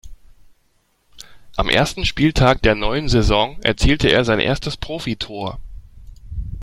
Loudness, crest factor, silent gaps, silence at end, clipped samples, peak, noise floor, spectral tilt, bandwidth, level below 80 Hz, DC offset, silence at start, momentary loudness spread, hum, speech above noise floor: -18 LUFS; 18 dB; none; 0 s; under 0.1%; 0 dBFS; -62 dBFS; -5 dB/octave; 14.5 kHz; -28 dBFS; under 0.1%; 0.05 s; 14 LU; none; 45 dB